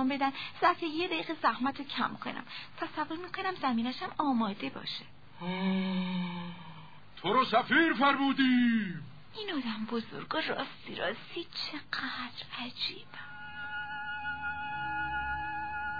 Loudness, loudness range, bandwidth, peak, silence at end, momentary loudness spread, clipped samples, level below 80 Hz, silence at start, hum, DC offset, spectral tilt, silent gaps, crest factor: -32 LUFS; 9 LU; 5 kHz; -12 dBFS; 0 s; 15 LU; under 0.1%; -62 dBFS; 0 s; 50 Hz at -60 dBFS; 0.3%; -6.5 dB/octave; none; 20 dB